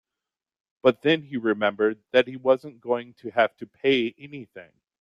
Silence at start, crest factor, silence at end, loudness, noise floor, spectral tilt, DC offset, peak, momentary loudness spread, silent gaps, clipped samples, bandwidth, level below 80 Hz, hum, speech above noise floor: 0.85 s; 20 dB; 0.4 s; -24 LUFS; -89 dBFS; -6.5 dB/octave; under 0.1%; -4 dBFS; 10 LU; none; under 0.1%; 7 kHz; -70 dBFS; none; 64 dB